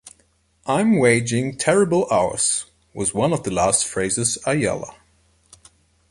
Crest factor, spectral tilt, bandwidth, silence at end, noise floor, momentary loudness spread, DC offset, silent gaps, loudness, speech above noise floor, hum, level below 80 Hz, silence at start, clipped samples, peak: 20 dB; -4 dB/octave; 12 kHz; 1.2 s; -61 dBFS; 9 LU; under 0.1%; none; -20 LUFS; 42 dB; none; -50 dBFS; 0.05 s; under 0.1%; -2 dBFS